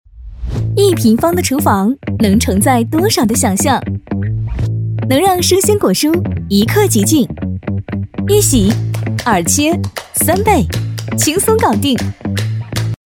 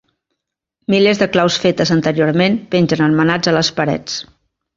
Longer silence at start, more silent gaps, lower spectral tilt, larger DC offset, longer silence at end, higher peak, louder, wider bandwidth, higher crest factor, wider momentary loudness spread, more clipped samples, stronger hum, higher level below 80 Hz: second, 0.15 s vs 0.9 s; neither; about the same, -5 dB/octave vs -5.5 dB/octave; neither; second, 0.15 s vs 0.55 s; about the same, 0 dBFS vs 0 dBFS; about the same, -13 LUFS vs -15 LUFS; first, 19 kHz vs 7.8 kHz; about the same, 14 dB vs 16 dB; about the same, 9 LU vs 7 LU; neither; neither; first, -32 dBFS vs -52 dBFS